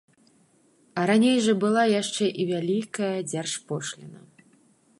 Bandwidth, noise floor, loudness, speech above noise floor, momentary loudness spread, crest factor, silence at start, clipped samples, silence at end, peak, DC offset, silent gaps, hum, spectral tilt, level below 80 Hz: 11.5 kHz; -62 dBFS; -25 LUFS; 38 dB; 12 LU; 16 dB; 0.95 s; under 0.1%; 0.85 s; -10 dBFS; under 0.1%; none; none; -4.5 dB/octave; -76 dBFS